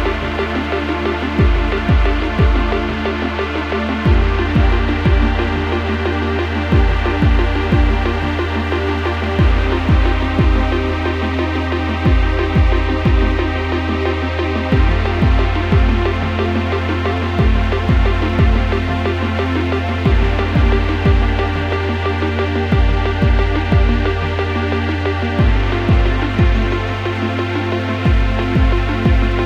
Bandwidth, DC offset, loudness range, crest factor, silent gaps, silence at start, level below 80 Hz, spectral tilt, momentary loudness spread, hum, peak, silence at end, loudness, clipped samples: 7.2 kHz; under 0.1%; 1 LU; 14 dB; none; 0 s; -18 dBFS; -7.5 dB/octave; 4 LU; none; 0 dBFS; 0 s; -17 LUFS; under 0.1%